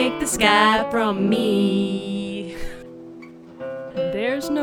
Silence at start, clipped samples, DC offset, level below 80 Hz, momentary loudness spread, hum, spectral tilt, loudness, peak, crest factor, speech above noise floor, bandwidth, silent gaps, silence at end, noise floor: 0 s; under 0.1%; under 0.1%; -44 dBFS; 23 LU; none; -4 dB/octave; -20 LUFS; 0 dBFS; 20 dB; 21 dB; 18 kHz; none; 0 s; -41 dBFS